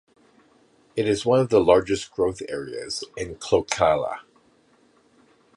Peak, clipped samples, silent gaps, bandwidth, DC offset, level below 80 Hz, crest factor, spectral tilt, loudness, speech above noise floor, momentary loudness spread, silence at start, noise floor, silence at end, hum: -4 dBFS; under 0.1%; none; 11.5 kHz; under 0.1%; -52 dBFS; 20 dB; -5 dB/octave; -23 LUFS; 38 dB; 14 LU; 0.95 s; -60 dBFS; 1.35 s; none